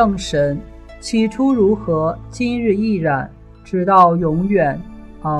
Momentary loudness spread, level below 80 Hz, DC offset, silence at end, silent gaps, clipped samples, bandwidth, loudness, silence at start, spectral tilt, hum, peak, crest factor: 16 LU; -38 dBFS; under 0.1%; 0 s; none; under 0.1%; 11 kHz; -17 LUFS; 0 s; -7 dB/octave; none; 0 dBFS; 16 dB